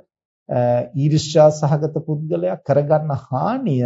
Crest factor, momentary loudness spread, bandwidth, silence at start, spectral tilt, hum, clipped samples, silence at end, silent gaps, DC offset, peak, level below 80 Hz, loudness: 16 dB; 9 LU; 8 kHz; 0.5 s; -7 dB/octave; none; under 0.1%; 0 s; none; under 0.1%; -2 dBFS; -58 dBFS; -18 LUFS